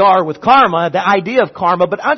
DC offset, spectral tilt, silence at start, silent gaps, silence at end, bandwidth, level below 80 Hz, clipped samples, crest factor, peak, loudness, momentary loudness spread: under 0.1%; -6 dB/octave; 0 s; none; 0 s; 6.4 kHz; -54 dBFS; under 0.1%; 12 dB; 0 dBFS; -12 LUFS; 5 LU